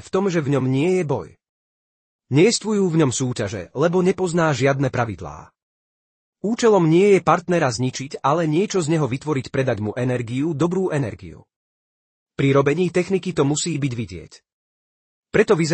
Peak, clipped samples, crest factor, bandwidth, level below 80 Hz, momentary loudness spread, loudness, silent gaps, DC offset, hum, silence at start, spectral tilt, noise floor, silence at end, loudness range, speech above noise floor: -2 dBFS; under 0.1%; 18 dB; 8.8 kHz; -56 dBFS; 10 LU; -20 LUFS; 1.49-2.19 s, 5.63-6.33 s, 11.56-12.26 s, 14.52-15.23 s; under 0.1%; none; 0.05 s; -6 dB/octave; under -90 dBFS; 0 s; 4 LU; over 71 dB